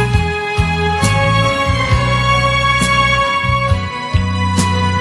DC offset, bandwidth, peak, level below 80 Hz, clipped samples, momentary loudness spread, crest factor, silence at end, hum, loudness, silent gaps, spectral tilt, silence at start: under 0.1%; 12 kHz; 0 dBFS; -26 dBFS; under 0.1%; 5 LU; 14 dB; 0 s; none; -14 LUFS; none; -5 dB/octave; 0 s